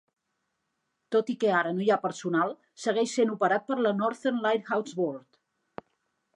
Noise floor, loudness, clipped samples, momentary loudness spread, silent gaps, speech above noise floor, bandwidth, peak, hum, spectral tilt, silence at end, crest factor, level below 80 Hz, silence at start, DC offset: -80 dBFS; -28 LUFS; under 0.1%; 11 LU; none; 53 dB; 11 kHz; -10 dBFS; none; -5 dB/octave; 1.15 s; 18 dB; -82 dBFS; 1.1 s; under 0.1%